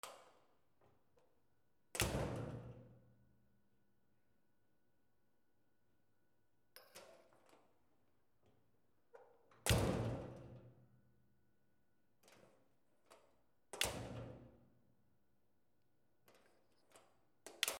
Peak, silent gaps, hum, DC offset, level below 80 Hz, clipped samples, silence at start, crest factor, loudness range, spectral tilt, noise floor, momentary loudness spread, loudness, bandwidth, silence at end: -18 dBFS; none; none; under 0.1%; -62 dBFS; under 0.1%; 0.05 s; 32 dB; 23 LU; -4 dB/octave; -84 dBFS; 24 LU; -42 LUFS; 16 kHz; 0 s